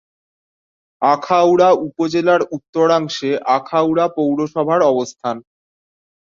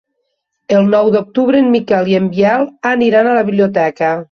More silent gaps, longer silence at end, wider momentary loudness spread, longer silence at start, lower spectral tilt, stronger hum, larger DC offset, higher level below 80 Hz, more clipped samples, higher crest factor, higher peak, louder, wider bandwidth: first, 2.69-2.73 s vs none; first, 0.8 s vs 0.1 s; first, 8 LU vs 4 LU; first, 1 s vs 0.7 s; second, -5.5 dB/octave vs -7.5 dB/octave; neither; neither; second, -62 dBFS vs -56 dBFS; neither; about the same, 16 dB vs 12 dB; about the same, 0 dBFS vs -2 dBFS; second, -16 LUFS vs -12 LUFS; first, 7.6 kHz vs 6.8 kHz